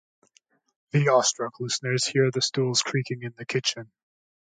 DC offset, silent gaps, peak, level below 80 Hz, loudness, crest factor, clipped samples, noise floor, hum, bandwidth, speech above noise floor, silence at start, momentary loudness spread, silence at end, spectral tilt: under 0.1%; none; -8 dBFS; -72 dBFS; -25 LUFS; 18 dB; under 0.1%; -65 dBFS; none; 9.6 kHz; 40 dB; 0.95 s; 10 LU; 0.65 s; -3.5 dB/octave